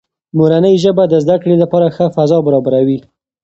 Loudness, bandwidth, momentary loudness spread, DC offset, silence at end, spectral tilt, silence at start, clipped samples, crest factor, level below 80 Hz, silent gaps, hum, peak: -12 LUFS; 8 kHz; 4 LU; under 0.1%; 0.45 s; -8 dB/octave; 0.35 s; under 0.1%; 12 dB; -52 dBFS; none; none; 0 dBFS